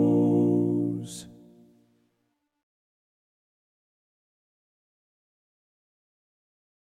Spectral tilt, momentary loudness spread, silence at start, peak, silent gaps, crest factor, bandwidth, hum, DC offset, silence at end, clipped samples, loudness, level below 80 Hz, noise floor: -8.5 dB/octave; 18 LU; 0 s; -12 dBFS; none; 18 dB; 12 kHz; none; under 0.1%; 5.6 s; under 0.1%; -25 LUFS; -76 dBFS; -77 dBFS